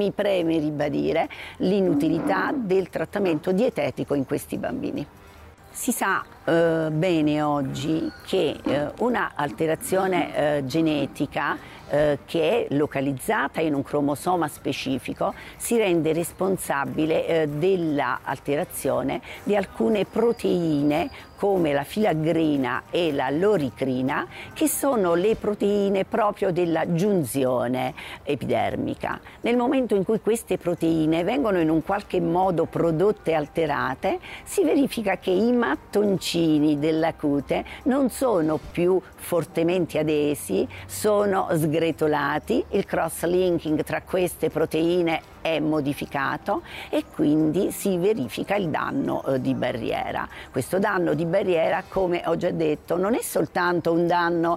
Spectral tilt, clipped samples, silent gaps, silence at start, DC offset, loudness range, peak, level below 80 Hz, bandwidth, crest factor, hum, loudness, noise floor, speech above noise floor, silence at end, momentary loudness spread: -5.5 dB/octave; under 0.1%; none; 0 s; under 0.1%; 2 LU; -12 dBFS; -52 dBFS; 16 kHz; 12 dB; none; -24 LUFS; -47 dBFS; 23 dB; 0 s; 6 LU